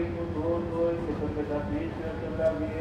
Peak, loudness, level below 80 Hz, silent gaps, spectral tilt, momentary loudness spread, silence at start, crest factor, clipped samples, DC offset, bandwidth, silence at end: -16 dBFS; -30 LUFS; -44 dBFS; none; -8.5 dB/octave; 5 LU; 0 s; 14 dB; under 0.1%; under 0.1%; 10 kHz; 0 s